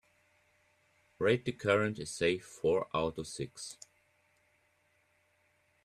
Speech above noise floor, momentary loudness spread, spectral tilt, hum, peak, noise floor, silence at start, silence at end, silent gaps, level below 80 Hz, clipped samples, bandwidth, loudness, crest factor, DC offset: 40 dB; 12 LU; -5 dB/octave; none; -14 dBFS; -73 dBFS; 1.2 s; 2.1 s; none; -66 dBFS; under 0.1%; 13 kHz; -33 LUFS; 22 dB; under 0.1%